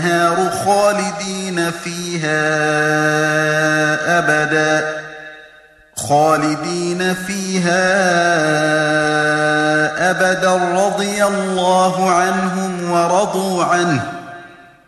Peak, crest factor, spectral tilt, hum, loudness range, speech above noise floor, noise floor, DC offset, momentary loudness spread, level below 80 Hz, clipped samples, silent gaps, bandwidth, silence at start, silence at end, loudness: -2 dBFS; 14 dB; -4 dB/octave; none; 2 LU; 30 dB; -46 dBFS; under 0.1%; 7 LU; -56 dBFS; under 0.1%; none; 13.5 kHz; 0 s; 0.25 s; -15 LUFS